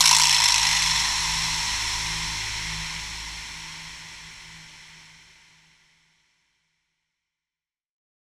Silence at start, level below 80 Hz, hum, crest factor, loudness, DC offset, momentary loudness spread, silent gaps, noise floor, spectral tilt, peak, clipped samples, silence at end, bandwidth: 0 s; -46 dBFS; none; 26 dB; -21 LUFS; under 0.1%; 25 LU; none; under -90 dBFS; 1 dB/octave; -2 dBFS; under 0.1%; 3.2 s; over 20 kHz